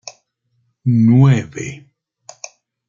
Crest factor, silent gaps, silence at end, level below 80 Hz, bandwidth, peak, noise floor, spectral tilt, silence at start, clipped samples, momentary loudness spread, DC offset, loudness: 16 dB; none; 1.1 s; -56 dBFS; 7.4 kHz; -2 dBFS; -66 dBFS; -7.5 dB/octave; 0.05 s; under 0.1%; 25 LU; under 0.1%; -14 LUFS